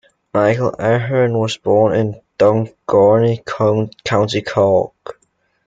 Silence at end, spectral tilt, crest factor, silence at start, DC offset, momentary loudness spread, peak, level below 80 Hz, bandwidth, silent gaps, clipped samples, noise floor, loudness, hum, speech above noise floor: 0.55 s; -6.5 dB/octave; 16 dB; 0.35 s; under 0.1%; 7 LU; 0 dBFS; -54 dBFS; 7.8 kHz; none; under 0.1%; -63 dBFS; -16 LUFS; none; 48 dB